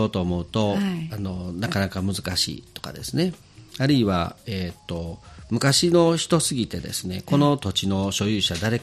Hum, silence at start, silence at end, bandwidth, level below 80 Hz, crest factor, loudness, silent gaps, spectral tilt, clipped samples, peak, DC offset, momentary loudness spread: none; 0 s; 0 s; 14.5 kHz; -48 dBFS; 18 dB; -23 LUFS; none; -4.5 dB/octave; under 0.1%; -6 dBFS; under 0.1%; 13 LU